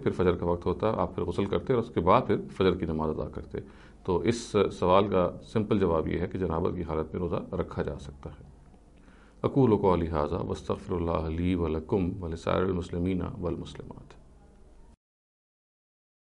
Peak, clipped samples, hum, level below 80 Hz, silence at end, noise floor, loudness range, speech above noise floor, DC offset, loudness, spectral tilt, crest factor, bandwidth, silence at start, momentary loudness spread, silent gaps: -8 dBFS; under 0.1%; none; -46 dBFS; 2.15 s; -54 dBFS; 6 LU; 26 dB; under 0.1%; -29 LUFS; -7.5 dB/octave; 22 dB; 11 kHz; 0 s; 13 LU; none